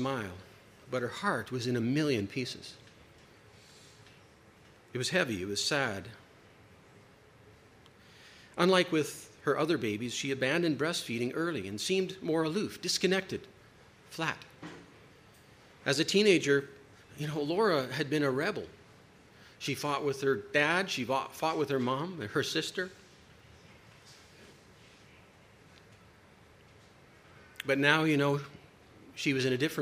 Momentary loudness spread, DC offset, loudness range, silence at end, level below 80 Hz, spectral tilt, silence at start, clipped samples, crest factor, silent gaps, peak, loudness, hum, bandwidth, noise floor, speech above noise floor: 16 LU; under 0.1%; 7 LU; 0 s; -70 dBFS; -4.5 dB/octave; 0 s; under 0.1%; 26 dB; none; -8 dBFS; -31 LUFS; none; 15.5 kHz; -59 dBFS; 28 dB